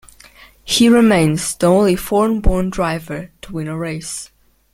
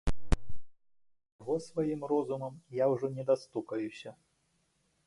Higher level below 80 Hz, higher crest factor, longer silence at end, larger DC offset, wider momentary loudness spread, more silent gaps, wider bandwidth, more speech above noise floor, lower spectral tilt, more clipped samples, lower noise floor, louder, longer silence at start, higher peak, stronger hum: first, -28 dBFS vs -44 dBFS; about the same, 16 dB vs 20 dB; second, 0.5 s vs 0.95 s; neither; first, 17 LU vs 10 LU; second, none vs 1.32-1.39 s; first, 16 kHz vs 11.5 kHz; second, 29 dB vs 42 dB; second, -5 dB/octave vs -7 dB/octave; neither; second, -45 dBFS vs -75 dBFS; first, -16 LUFS vs -34 LUFS; first, 0.65 s vs 0.05 s; first, -2 dBFS vs -14 dBFS; neither